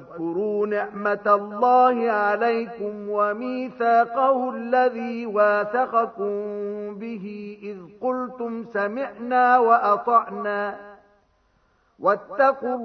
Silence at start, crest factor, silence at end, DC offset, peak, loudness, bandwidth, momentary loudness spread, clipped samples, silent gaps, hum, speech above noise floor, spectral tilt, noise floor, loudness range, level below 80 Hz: 0 s; 16 dB; 0 s; under 0.1%; -6 dBFS; -22 LUFS; 6 kHz; 14 LU; under 0.1%; none; none; 42 dB; -7.5 dB/octave; -64 dBFS; 5 LU; -70 dBFS